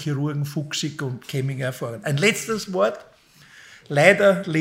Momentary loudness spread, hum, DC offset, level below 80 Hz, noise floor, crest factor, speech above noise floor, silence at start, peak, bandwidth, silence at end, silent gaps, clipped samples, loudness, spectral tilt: 12 LU; none; under 0.1%; -66 dBFS; -50 dBFS; 22 dB; 29 dB; 0 s; 0 dBFS; 16 kHz; 0 s; none; under 0.1%; -22 LUFS; -5 dB/octave